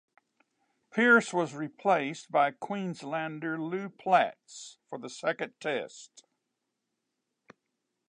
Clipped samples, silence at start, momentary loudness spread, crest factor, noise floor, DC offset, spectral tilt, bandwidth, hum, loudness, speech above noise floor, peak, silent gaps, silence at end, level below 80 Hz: under 0.1%; 0.95 s; 20 LU; 22 dB; -84 dBFS; under 0.1%; -5 dB/octave; 10.5 kHz; none; -29 LUFS; 54 dB; -10 dBFS; none; 1.9 s; -88 dBFS